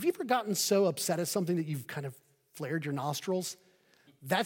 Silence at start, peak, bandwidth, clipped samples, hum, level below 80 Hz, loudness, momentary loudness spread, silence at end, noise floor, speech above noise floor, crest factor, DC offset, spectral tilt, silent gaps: 0 s; -14 dBFS; 17 kHz; under 0.1%; none; -82 dBFS; -32 LUFS; 14 LU; 0 s; -65 dBFS; 33 dB; 18 dB; under 0.1%; -4 dB/octave; none